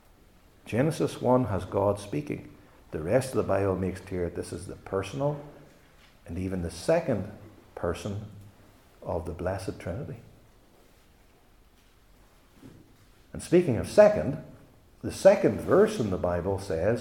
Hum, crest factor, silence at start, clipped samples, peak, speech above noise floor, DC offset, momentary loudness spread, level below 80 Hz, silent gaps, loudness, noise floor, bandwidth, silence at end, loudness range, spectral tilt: none; 24 dB; 0.65 s; under 0.1%; -6 dBFS; 33 dB; under 0.1%; 18 LU; -56 dBFS; none; -27 LUFS; -59 dBFS; 16.5 kHz; 0 s; 14 LU; -6.5 dB/octave